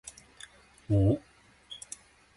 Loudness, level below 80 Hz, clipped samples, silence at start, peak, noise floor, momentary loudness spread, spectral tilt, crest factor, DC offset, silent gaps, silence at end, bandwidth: -30 LUFS; -48 dBFS; under 0.1%; 0.05 s; -14 dBFS; -53 dBFS; 24 LU; -7 dB/octave; 18 dB; under 0.1%; none; 0.6 s; 11.5 kHz